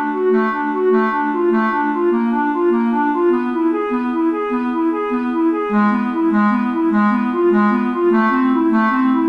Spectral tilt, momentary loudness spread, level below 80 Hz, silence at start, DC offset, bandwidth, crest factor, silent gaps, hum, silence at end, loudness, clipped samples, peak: -8.5 dB/octave; 4 LU; -56 dBFS; 0 s; under 0.1%; 5.4 kHz; 10 dB; none; none; 0 s; -17 LUFS; under 0.1%; -6 dBFS